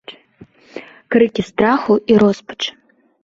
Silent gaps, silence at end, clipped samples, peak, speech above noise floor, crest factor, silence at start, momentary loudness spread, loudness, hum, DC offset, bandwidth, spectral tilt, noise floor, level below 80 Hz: none; 0.55 s; under 0.1%; -2 dBFS; 31 dB; 16 dB; 0.1 s; 22 LU; -16 LUFS; none; under 0.1%; 7.6 kHz; -6 dB/octave; -46 dBFS; -52 dBFS